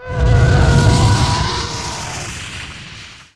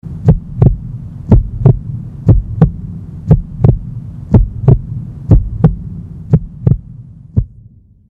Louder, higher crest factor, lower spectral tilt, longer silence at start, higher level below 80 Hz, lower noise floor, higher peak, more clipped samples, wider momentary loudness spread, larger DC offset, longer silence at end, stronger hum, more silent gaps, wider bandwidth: about the same, -15 LUFS vs -13 LUFS; about the same, 16 dB vs 12 dB; second, -5 dB/octave vs -12.5 dB/octave; about the same, 0 s vs 0.05 s; about the same, -22 dBFS vs -20 dBFS; second, -36 dBFS vs -41 dBFS; about the same, 0 dBFS vs 0 dBFS; second, under 0.1% vs 0.6%; about the same, 18 LU vs 16 LU; first, 0.5% vs under 0.1%; second, 0.15 s vs 0.6 s; neither; neither; first, 12 kHz vs 2.8 kHz